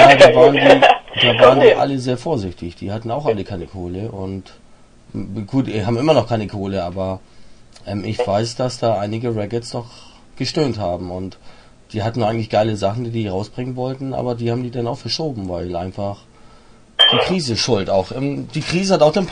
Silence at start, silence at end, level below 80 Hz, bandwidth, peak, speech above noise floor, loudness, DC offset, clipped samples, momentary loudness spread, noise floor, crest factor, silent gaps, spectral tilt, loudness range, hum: 0 s; 0 s; -46 dBFS; 10.5 kHz; 0 dBFS; 29 dB; -17 LUFS; under 0.1%; under 0.1%; 18 LU; -46 dBFS; 18 dB; none; -5 dB/octave; 9 LU; none